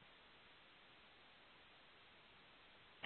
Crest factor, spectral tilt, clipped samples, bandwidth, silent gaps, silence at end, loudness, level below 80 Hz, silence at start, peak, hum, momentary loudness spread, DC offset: 30 dB; -0.5 dB/octave; under 0.1%; 4.3 kHz; none; 0 s; -65 LUFS; -84 dBFS; 0 s; -34 dBFS; none; 0 LU; under 0.1%